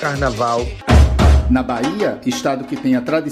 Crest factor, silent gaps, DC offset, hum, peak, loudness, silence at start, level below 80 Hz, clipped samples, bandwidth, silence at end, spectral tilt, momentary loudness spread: 14 dB; none; under 0.1%; none; 0 dBFS; -16 LUFS; 0 s; -18 dBFS; under 0.1%; 13 kHz; 0 s; -6.5 dB/octave; 8 LU